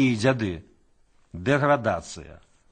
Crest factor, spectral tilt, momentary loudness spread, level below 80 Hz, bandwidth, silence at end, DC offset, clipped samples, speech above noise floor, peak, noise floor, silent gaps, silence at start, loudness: 20 dB; -6 dB/octave; 19 LU; -52 dBFS; 9.4 kHz; 0.35 s; under 0.1%; under 0.1%; 36 dB; -6 dBFS; -60 dBFS; none; 0 s; -24 LUFS